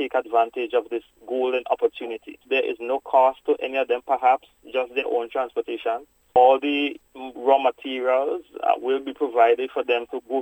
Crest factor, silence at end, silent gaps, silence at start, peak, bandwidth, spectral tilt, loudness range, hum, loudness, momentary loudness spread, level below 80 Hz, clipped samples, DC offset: 18 dB; 0 s; none; 0 s; -4 dBFS; 16 kHz; -4.5 dB/octave; 2 LU; none; -23 LUFS; 10 LU; -66 dBFS; under 0.1%; under 0.1%